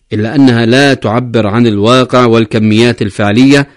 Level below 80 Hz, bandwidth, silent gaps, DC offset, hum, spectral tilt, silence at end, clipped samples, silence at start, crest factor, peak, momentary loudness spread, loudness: -44 dBFS; 11 kHz; none; under 0.1%; none; -6 dB/octave; 0.1 s; 2%; 0.1 s; 8 dB; 0 dBFS; 5 LU; -8 LUFS